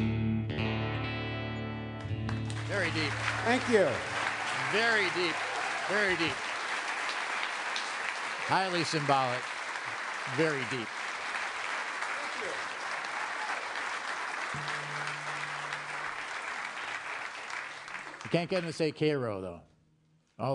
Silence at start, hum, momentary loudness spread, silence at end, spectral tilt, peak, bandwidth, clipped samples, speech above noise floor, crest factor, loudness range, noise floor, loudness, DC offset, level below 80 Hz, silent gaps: 0 s; none; 9 LU; 0 s; -4.5 dB/octave; -12 dBFS; 11 kHz; under 0.1%; 38 dB; 20 dB; 6 LU; -68 dBFS; -32 LUFS; under 0.1%; -60 dBFS; none